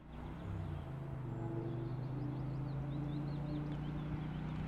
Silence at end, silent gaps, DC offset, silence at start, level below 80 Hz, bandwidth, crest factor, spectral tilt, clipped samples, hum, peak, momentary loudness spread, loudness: 0 s; none; under 0.1%; 0 s; -54 dBFS; 5.6 kHz; 12 dB; -9.5 dB/octave; under 0.1%; none; -30 dBFS; 4 LU; -43 LUFS